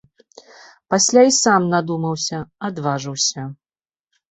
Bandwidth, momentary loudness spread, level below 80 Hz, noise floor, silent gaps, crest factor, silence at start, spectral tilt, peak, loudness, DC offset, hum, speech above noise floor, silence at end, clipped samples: 8.4 kHz; 15 LU; -60 dBFS; under -90 dBFS; none; 18 dB; 0.9 s; -3.5 dB/octave; 0 dBFS; -18 LUFS; under 0.1%; none; over 72 dB; 0.8 s; under 0.1%